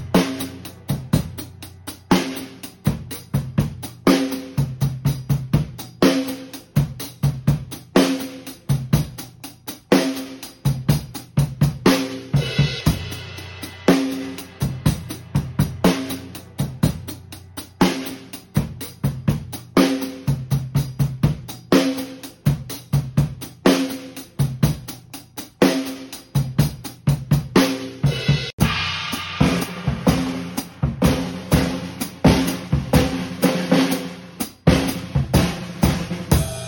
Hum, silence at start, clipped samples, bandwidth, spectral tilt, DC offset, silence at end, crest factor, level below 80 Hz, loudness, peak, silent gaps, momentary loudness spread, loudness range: none; 0 s; under 0.1%; 17 kHz; -6 dB/octave; under 0.1%; 0 s; 20 dB; -36 dBFS; -21 LUFS; -2 dBFS; 28.53-28.58 s; 14 LU; 3 LU